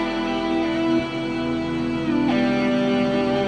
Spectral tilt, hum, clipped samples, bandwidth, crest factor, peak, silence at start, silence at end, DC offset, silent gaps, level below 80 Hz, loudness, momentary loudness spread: -6.5 dB/octave; none; under 0.1%; 9.2 kHz; 12 dB; -10 dBFS; 0 s; 0 s; under 0.1%; none; -46 dBFS; -22 LUFS; 4 LU